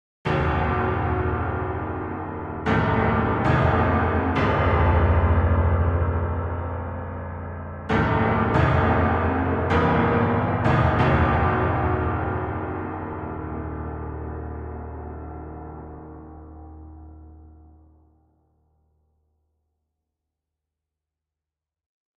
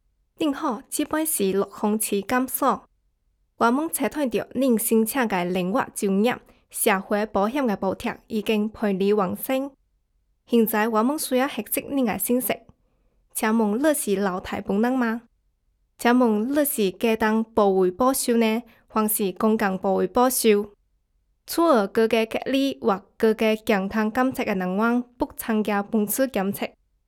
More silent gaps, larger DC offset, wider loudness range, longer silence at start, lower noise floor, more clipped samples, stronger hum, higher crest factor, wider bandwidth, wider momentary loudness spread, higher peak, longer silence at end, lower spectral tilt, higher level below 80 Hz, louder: neither; neither; first, 16 LU vs 3 LU; second, 0.25 s vs 0.4 s; first, -89 dBFS vs -69 dBFS; neither; neither; about the same, 16 dB vs 18 dB; second, 5.8 kHz vs 19 kHz; first, 17 LU vs 7 LU; about the same, -6 dBFS vs -6 dBFS; first, 4.7 s vs 0.4 s; first, -9 dB/octave vs -4.5 dB/octave; first, -34 dBFS vs -58 dBFS; about the same, -23 LUFS vs -23 LUFS